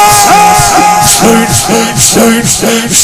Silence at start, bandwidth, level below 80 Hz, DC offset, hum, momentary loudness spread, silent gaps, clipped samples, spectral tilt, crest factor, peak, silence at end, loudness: 0 s; over 20 kHz; -28 dBFS; under 0.1%; none; 4 LU; none; 5%; -2.5 dB/octave; 6 dB; 0 dBFS; 0 s; -5 LUFS